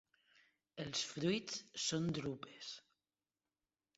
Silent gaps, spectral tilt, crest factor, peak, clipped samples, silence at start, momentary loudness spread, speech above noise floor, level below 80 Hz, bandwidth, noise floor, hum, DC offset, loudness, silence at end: none; -4.5 dB/octave; 20 dB; -24 dBFS; under 0.1%; 0.75 s; 12 LU; over 48 dB; -76 dBFS; 7.6 kHz; under -90 dBFS; none; under 0.1%; -41 LUFS; 1.2 s